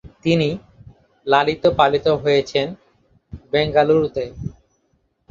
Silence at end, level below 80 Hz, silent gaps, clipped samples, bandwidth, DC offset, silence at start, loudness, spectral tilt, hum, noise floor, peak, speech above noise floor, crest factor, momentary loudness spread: 0.8 s; -46 dBFS; none; under 0.1%; 7.4 kHz; under 0.1%; 0.05 s; -18 LUFS; -6.5 dB/octave; none; -66 dBFS; 0 dBFS; 48 dB; 20 dB; 15 LU